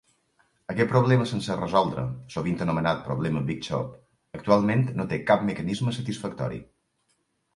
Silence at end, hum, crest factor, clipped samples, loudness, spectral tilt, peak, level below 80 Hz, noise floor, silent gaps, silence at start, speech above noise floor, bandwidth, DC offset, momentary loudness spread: 0.95 s; none; 22 dB; under 0.1%; -26 LUFS; -7 dB/octave; -6 dBFS; -54 dBFS; -72 dBFS; none; 0.7 s; 47 dB; 11.5 kHz; under 0.1%; 12 LU